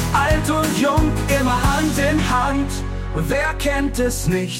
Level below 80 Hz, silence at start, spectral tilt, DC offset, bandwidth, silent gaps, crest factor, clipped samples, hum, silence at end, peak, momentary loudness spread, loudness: -26 dBFS; 0 s; -5 dB/octave; under 0.1%; 16.5 kHz; none; 12 dB; under 0.1%; none; 0 s; -6 dBFS; 5 LU; -19 LUFS